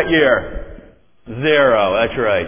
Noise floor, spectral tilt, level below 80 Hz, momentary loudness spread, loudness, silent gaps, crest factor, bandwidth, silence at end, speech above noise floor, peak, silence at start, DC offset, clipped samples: -44 dBFS; -9 dB/octave; -38 dBFS; 19 LU; -15 LUFS; none; 16 dB; 3.6 kHz; 0 s; 29 dB; 0 dBFS; 0 s; under 0.1%; under 0.1%